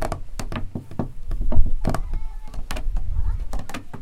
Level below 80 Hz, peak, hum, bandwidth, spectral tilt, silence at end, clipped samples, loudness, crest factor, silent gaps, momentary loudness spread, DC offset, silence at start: -24 dBFS; -2 dBFS; none; 9.2 kHz; -6 dB/octave; 0 s; under 0.1%; -30 LUFS; 18 dB; none; 9 LU; under 0.1%; 0 s